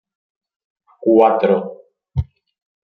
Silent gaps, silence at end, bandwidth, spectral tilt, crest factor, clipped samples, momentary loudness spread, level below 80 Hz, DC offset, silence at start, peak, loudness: none; 0.65 s; 5 kHz; -10 dB/octave; 18 dB; under 0.1%; 18 LU; -42 dBFS; under 0.1%; 1 s; -2 dBFS; -17 LUFS